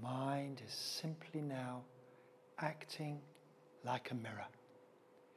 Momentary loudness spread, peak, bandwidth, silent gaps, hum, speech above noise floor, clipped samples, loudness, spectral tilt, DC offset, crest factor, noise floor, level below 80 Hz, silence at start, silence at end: 23 LU; -22 dBFS; 15.5 kHz; none; none; 21 dB; under 0.1%; -45 LUFS; -5 dB/octave; under 0.1%; 24 dB; -67 dBFS; -88 dBFS; 0 s; 0.05 s